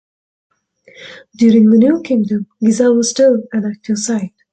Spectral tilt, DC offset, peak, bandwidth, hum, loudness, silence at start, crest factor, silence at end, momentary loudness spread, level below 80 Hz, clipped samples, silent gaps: -5.5 dB/octave; under 0.1%; -2 dBFS; 9 kHz; none; -13 LUFS; 1 s; 12 dB; 0.25 s; 11 LU; -58 dBFS; under 0.1%; none